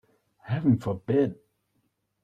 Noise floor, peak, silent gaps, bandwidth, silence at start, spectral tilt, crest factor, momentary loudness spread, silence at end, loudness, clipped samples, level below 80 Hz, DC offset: -74 dBFS; -12 dBFS; none; 7.8 kHz; 0.45 s; -9.5 dB/octave; 18 dB; 6 LU; 0.9 s; -27 LUFS; under 0.1%; -62 dBFS; under 0.1%